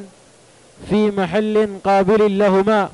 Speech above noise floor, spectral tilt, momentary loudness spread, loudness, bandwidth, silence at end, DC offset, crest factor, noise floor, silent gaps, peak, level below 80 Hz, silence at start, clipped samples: 33 dB; -7 dB/octave; 4 LU; -16 LUFS; 11.5 kHz; 0.05 s; under 0.1%; 10 dB; -48 dBFS; none; -6 dBFS; -48 dBFS; 0 s; under 0.1%